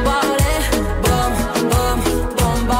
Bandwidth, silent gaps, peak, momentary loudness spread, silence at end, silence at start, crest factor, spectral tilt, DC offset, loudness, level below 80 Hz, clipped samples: 16.5 kHz; none; -6 dBFS; 2 LU; 0 s; 0 s; 12 dB; -4.5 dB/octave; under 0.1%; -18 LUFS; -22 dBFS; under 0.1%